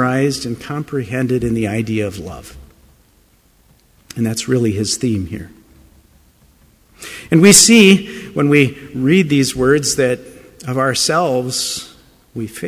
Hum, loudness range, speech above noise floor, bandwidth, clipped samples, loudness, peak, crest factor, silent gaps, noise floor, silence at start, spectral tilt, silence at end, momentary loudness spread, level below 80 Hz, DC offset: none; 11 LU; 38 dB; 16 kHz; under 0.1%; -14 LUFS; 0 dBFS; 16 dB; none; -53 dBFS; 0 s; -4 dB/octave; 0 s; 22 LU; -44 dBFS; under 0.1%